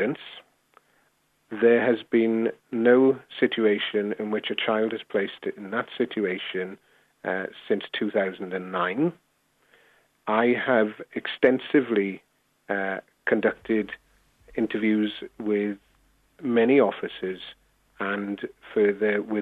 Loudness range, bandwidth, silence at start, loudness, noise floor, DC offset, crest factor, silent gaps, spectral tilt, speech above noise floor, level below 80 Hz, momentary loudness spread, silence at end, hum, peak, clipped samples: 6 LU; 4.6 kHz; 0 s; -25 LUFS; -68 dBFS; under 0.1%; 22 dB; none; -7.5 dB/octave; 43 dB; -68 dBFS; 13 LU; 0 s; none; -4 dBFS; under 0.1%